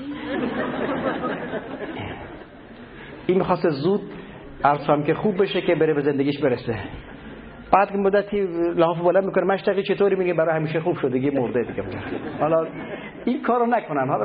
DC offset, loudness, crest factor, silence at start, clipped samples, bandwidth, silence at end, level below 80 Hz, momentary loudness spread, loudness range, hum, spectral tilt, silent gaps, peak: under 0.1%; -22 LUFS; 22 dB; 0 s; under 0.1%; 5.2 kHz; 0 s; -52 dBFS; 18 LU; 5 LU; none; -11.5 dB/octave; none; -2 dBFS